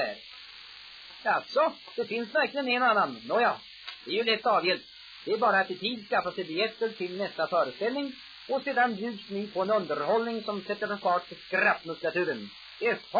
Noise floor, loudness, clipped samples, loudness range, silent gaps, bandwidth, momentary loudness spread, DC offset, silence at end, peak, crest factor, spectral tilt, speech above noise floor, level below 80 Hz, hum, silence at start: -48 dBFS; -29 LUFS; under 0.1%; 3 LU; none; 5 kHz; 16 LU; under 0.1%; 0 s; -12 dBFS; 16 dB; -5.5 dB/octave; 19 dB; -74 dBFS; none; 0 s